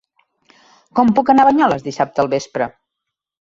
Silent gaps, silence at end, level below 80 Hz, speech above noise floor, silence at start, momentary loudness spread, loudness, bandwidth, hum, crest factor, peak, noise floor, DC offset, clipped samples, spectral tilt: none; 0.75 s; -56 dBFS; 66 dB; 0.95 s; 12 LU; -16 LUFS; 7.8 kHz; none; 16 dB; -2 dBFS; -81 dBFS; under 0.1%; under 0.1%; -6 dB/octave